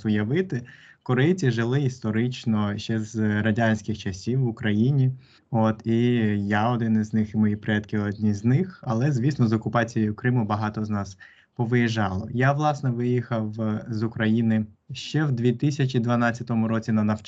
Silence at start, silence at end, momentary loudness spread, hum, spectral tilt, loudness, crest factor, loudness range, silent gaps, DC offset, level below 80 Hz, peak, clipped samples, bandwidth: 0 s; 0 s; 7 LU; none; -7.5 dB/octave; -24 LUFS; 16 dB; 2 LU; none; under 0.1%; -60 dBFS; -8 dBFS; under 0.1%; 7.8 kHz